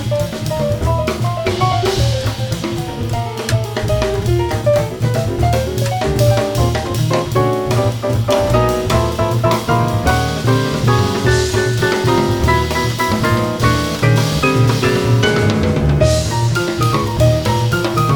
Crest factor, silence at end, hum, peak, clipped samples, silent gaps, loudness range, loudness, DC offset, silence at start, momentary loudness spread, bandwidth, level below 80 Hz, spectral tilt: 14 dB; 0 s; none; 0 dBFS; under 0.1%; none; 4 LU; -16 LUFS; under 0.1%; 0 s; 5 LU; 20 kHz; -28 dBFS; -5.5 dB/octave